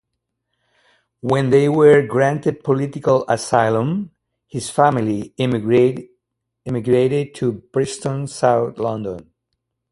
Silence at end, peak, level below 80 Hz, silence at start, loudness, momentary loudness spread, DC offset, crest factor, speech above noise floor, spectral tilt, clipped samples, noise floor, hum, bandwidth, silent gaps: 0.7 s; 0 dBFS; -56 dBFS; 1.25 s; -18 LUFS; 13 LU; under 0.1%; 18 dB; 60 dB; -6.5 dB/octave; under 0.1%; -77 dBFS; none; 11.5 kHz; none